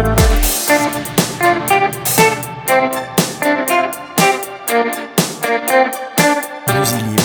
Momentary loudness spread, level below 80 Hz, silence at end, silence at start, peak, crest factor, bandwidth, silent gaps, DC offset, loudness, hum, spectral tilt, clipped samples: 5 LU; -26 dBFS; 0 s; 0 s; 0 dBFS; 14 dB; over 20 kHz; none; under 0.1%; -15 LUFS; none; -3.5 dB/octave; under 0.1%